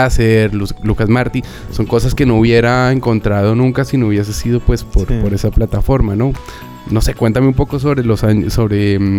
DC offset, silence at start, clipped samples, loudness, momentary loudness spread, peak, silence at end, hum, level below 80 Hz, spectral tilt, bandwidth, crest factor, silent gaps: under 0.1%; 0 s; under 0.1%; -14 LUFS; 7 LU; 0 dBFS; 0 s; none; -22 dBFS; -7 dB/octave; 16 kHz; 12 dB; none